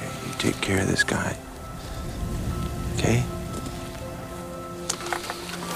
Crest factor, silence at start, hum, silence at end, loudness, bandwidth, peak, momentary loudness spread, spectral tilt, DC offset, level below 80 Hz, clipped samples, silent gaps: 24 dB; 0 s; none; 0 s; -28 LUFS; 16 kHz; -4 dBFS; 12 LU; -4.5 dB/octave; under 0.1%; -38 dBFS; under 0.1%; none